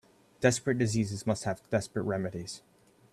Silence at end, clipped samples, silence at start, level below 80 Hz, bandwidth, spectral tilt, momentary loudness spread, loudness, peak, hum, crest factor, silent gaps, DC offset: 0.55 s; under 0.1%; 0.4 s; -62 dBFS; 14 kHz; -5.5 dB/octave; 12 LU; -31 LUFS; -10 dBFS; none; 22 dB; none; under 0.1%